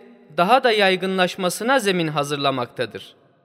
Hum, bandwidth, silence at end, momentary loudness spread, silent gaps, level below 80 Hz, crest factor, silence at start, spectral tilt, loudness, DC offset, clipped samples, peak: none; 16 kHz; 0.35 s; 13 LU; none; -72 dBFS; 18 dB; 0.3 s; -4 dB/octave; -20 LUFS; under 0.1%; under 0.1%; -2 dBFS